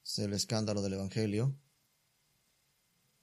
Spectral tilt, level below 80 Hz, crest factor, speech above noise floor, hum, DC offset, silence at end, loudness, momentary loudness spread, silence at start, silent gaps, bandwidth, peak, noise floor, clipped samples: -5 dB/octave; -72 dBFS; 20 dB; 41 dB; none; under 0.1%; 1.65 s; -35 LUFS; 4 LU; 0.05 s; none; 14.5 kHz; -18 dBFS; -75 dBFS; under 0.1%